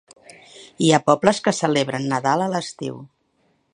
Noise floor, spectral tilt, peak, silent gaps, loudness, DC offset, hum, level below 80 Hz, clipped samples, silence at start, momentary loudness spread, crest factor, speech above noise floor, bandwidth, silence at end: -65 dBFS; -4.5 dB/octave; 0 dBFS; none; -20 LUFS; under 0.1%; none; -64 dBFS; under 0.1%; 0.55 s; 15 LU; 22 dB; 46 dB; 10.5 kHz; 0.65 s